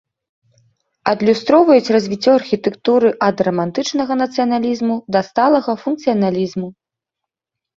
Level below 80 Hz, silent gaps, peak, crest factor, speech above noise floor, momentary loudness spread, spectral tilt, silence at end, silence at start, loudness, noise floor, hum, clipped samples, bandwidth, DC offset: -58 dBFS; none; 0 dBFS; 16 dB; 69 dB; 8 LU; -6 dB/octave; 1.05 s; 1.05 s; -16 LUFS; -84 dBFS; none; under 0.1%; 7.6 kHz; under 0.1%